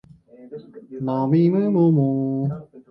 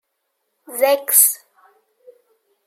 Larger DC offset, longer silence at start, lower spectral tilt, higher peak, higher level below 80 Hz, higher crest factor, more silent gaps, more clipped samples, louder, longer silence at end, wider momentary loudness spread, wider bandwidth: neither; second, 0.4 s vs 0.7 s; first, -12.5 dB/octave vs 2.5 dB/octave; second, -6 dBFS vs 0 dBFS; first, -62 dBFS vs -86 dBFS; second, 14 dB vs 22 dB; neither; neither; second, -20 LUFS vs -14 LUFS; second, 0.1 s vs 1.3 s; first, 22 LU vs 19 LU; second, 5.6 kHz vs 16.5 kHz